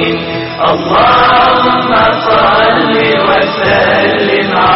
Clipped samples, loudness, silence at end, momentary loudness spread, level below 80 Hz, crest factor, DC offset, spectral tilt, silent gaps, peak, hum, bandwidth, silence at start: under 0.1%; -8 LUFS; 0 s; 6 LU; -36 dBFS; 8 dB; under 0.1%; -2 dB/octave; none; 0 dBFS; none; 6 kHz; 0 s